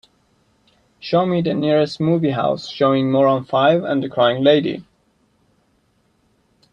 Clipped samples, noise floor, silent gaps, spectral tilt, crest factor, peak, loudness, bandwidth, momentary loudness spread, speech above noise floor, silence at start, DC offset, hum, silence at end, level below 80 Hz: under 0.1%; -62 dBFS; none; -7.5 dB/octave; 18 dB; -2 dBFS; -17 LUFS; 8.6 kHz; 6 LU; 45 dB; 1.05 s; under 0.1%; none; 1.9 s; -60 dBFS